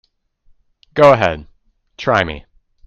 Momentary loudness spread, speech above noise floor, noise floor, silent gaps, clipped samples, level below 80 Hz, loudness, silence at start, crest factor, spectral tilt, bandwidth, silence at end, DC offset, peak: 18 LU; 41 dB; -54 dBFS; none; 0.1%; -44 dBFS; -15 LUFS; 0.95 s; 18 dB; -6 dB/octave; 7.8 kHz; 0.45 s; under 0.1%; 0 dBFS